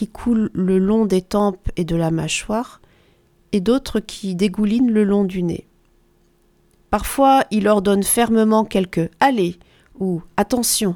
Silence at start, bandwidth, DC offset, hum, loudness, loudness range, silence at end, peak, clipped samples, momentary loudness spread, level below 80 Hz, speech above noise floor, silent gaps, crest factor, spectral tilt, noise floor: 0 s; 19.5 kHz; under 0.1%; none; -18 LUFS; 4 LU; 0 s; 0 dBFS; under 0.1%; 9 LU; -40 dBFS; 40 dB; none; 18 dB; -5 dB/octave; -57 dBFS